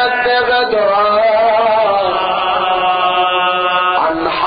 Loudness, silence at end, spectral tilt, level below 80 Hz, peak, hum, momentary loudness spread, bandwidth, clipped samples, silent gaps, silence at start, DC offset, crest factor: -13 LUFS; 0 s; -7.5 dB/octave; -48 dBFS; -2 dBFS; none; 3 LU; 5 kHz; under 0.1%; none; 0 s; under 0.1%; 10 dB